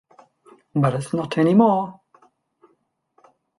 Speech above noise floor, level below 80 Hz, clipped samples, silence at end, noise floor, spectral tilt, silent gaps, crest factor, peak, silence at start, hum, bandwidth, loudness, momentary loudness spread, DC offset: 49 dB; -62 dBFS; under 0.1%; 1.65 s; -67 dBFS; -8 dB/octave; none; 18 dB; -4 dBFS; 0.75 s; none; 11.5 kHz; -20 LUFS; 11 LU; under 0.1%